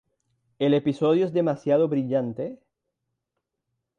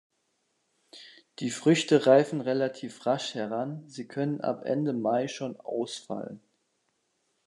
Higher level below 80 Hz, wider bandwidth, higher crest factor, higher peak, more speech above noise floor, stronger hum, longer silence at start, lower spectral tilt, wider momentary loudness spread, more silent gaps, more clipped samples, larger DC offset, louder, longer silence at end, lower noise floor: first, -70 dBFS vs -80 dBFS; second, 9 kHz vs 11 kHz; second, 16 dB vs 22 dB; about the same, -10 dBFS vs -8 dBFS; first, 59 dB vs 48 dB; neither; second, 0.6 s vs 0.95 s; first, -8.5 dB/octave vs -5.5 dB/octave; second, 9 LU vs 16 LU; neither; neither; neither; first, -24 LUFS vs -28 LUFS; first, 1.45 s vs 1.1 s; first, -82 dBFS vs -76 dBFS